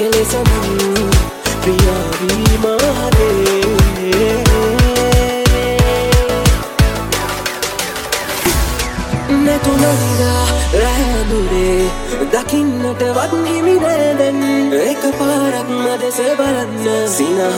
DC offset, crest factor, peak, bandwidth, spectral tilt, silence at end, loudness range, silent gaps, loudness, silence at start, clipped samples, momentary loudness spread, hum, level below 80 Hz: under 0.1%; 14 dB; 0 dBFS; 17 kHz; -5 dB/octave; 0 s; 3 LU; none; -14 LUFS; 0 s; under 0.1%; 5 LU; none; -20 dBFS